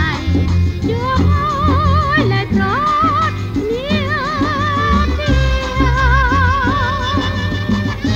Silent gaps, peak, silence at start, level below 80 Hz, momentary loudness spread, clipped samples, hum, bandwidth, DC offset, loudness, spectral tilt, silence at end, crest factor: none; 0 dBFS; 0 s; -22 dBFS; 5 LU; under 0.1%; none; 7.8 kHz; under 0.1%; -15 LUFS; -6.5 dB/octave; 0 s; 14 dB